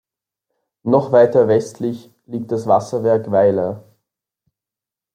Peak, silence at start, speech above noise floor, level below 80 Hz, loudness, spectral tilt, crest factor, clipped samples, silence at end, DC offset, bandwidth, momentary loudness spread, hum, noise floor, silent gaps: -2 dBFS; 0.85 s; 72 dB; -64 dBFS; -17 LUFS; -7.5 dB/octave; 16 dB; under 0.1%; 1.35 s; under 0.1%; 10.5 kHz; 16 LU; none; -88 dBFS; none